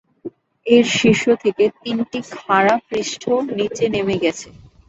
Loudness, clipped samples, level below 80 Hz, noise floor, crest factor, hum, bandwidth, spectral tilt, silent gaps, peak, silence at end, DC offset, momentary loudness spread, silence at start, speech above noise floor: -18 LUFS; under 0.1%; -54 dBFS; -37 dBFS; 16 dB; none; 8 kHz; -4.5 dB/octave; none; -2 dBFS; 0.4 s; under 0.1%; 16 LU; 0.25 s; 19 dB